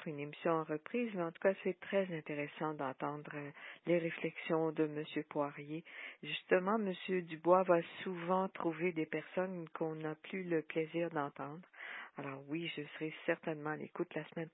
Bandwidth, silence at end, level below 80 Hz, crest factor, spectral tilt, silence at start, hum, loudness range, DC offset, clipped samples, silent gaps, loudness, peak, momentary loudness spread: 3.9 kHz; 0.05 s; -90 dBFS; 24 dB; -3 dB/octave; 0 s; none; 6 LU; under 0.1%; under 0.1%; none; -39 LUFS; -16 dBFS; 12 LU